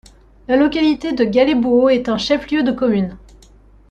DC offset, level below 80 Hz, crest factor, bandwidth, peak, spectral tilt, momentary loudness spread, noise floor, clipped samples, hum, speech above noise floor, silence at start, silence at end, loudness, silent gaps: under 0.1%; -44 dBFS; 14 dB; 8.6 kHz; -2 dBFS; -6 dB/octave; 5 LU; -46 dBFS; under 0.1%; none; 31 dB; 0.5 s; 0.75 s; -16 LUFS; none